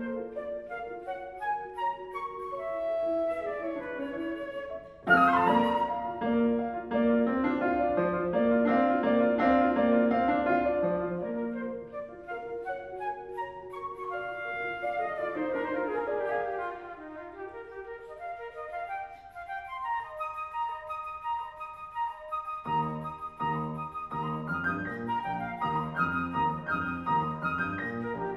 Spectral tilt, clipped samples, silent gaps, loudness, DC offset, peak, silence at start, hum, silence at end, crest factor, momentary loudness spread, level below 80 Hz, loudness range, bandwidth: -8 dB/octave; under 0.1%; none; -30 LUFS; under 0.1%; -10 dBFS; 0 s; none; 0 s; 20 dB; 15 LU; -58 dBFS; 11 LU; 12 kHz